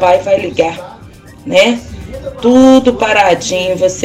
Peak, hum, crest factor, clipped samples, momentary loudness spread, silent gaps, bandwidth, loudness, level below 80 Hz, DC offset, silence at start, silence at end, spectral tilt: 0 dBFS; none; 12 dB; under 0.1%; 19 LU; none; 14 kHz; -10 LUFS; -38 dBFS; under 0.1%; 0 s; 0 s; -4 dB/octave